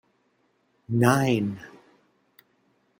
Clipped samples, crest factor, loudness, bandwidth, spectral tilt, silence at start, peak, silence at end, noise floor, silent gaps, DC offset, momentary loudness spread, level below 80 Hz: under 0.1%; 24 dB; -24 LUFS; 16.5 kHz; -6.5 dB/octave; 0.9 s; -4 dBFS; 1.35 s; -69 dBFS; none; under 0.1%; 21 LU; -66 dBFS